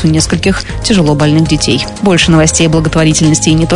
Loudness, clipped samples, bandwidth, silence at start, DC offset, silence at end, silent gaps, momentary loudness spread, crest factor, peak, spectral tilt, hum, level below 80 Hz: -9 LUFS; under 0.1%; 11 kHz; 0 s; under 0.1%; 0 s; none; 5 LU; 8 dB; 0 dBFS; -4.5 dB/octave; none; -24 dBFS